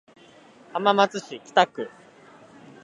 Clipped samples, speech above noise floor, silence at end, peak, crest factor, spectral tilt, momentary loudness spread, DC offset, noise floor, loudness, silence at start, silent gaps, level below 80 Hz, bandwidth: under 0.1%; 29 dB; 0.95 s; -4 dBFS; 24 dB; -4 dB/octave; 16 LU; under 0.1%; -51 dBFS; -23 LUFS; 0.75 s; none; -80 dBFS; 11 kHz